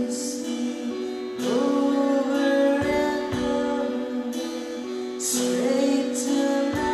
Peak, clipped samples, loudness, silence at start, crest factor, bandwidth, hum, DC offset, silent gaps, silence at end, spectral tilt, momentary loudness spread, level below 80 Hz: -10 dBFS; under 0.1%; -24 LUFS; 0 s; 14 dB; 13.5 kHz; none; under 0.1%; none; 0 s; -4 dB/octave; 9 LU; -54 dBFS